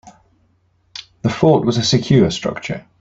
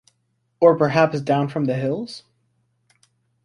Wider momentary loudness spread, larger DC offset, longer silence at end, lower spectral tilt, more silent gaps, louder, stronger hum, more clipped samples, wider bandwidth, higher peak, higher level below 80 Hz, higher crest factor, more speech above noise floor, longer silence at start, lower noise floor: first, 21 LU vs 14 LU; neither; second, 0.2 s vs 1.25 s; second, -6 dB/octave vs -7.5 dB/octave; neither; first, -16 LUFS vs -20 LUFS; neither; neither; second, 8 kHz vs 10.5 kHz; about the same, -2 dBFS vs -2 dBFS; first, -48 dBFS vs -62 dBFS; about the same, 16 dB vs 20 dB; second, 44 dB vs 51 dB; second, 0.05 s vs 0.6 s; second, -60 dBFS vs -70 dBFS